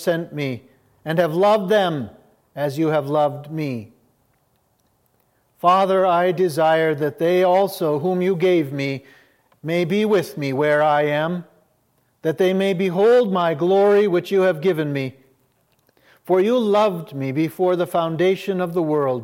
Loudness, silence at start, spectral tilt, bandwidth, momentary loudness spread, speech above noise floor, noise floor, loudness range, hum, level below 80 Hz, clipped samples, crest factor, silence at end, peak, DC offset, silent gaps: -19 LUFS; 0 s; -6.5 dB/octave; 16.5 kHz; 11 LU; 46 dB; -64 dBFS; 4 LU; none; -70 dBFS; under 0.1%; 16 dB; 0 s; -4 dBFS; under 0.1%; none